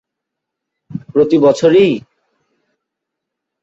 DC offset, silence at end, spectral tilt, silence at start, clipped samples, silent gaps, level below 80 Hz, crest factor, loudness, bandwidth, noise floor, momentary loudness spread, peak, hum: under 0.1%; 1.65 s; -6.5 dB/octave; 0.9 s; under 0.1%; none; -56 dBFS; 16 dB; -12 LUFS; 8 kHz; -79 dBFS; 18 LU; 0 dBFS; none